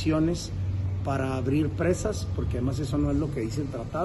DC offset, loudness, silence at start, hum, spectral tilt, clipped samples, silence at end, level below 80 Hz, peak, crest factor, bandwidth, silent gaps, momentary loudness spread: under 0.1%; -28 LUFS; 0 s; none; -7 dB/octave; under 0.1%; 0 s; -38 dBFS; -12 dBFS; 14 dB; 12 kHz; none; 5 LU